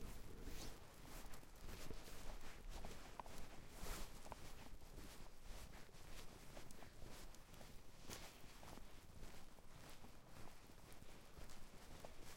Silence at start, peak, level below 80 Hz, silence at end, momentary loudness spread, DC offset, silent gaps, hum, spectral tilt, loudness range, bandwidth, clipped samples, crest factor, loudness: 0 s; -32 dBFS; -58 dBFS; 0 s; 7 LU; under 0.1%; none; none; -3.5 dB/octave; 5 LU; 16.5 kHz; under 0.1%; 20 dB; -59 LUFS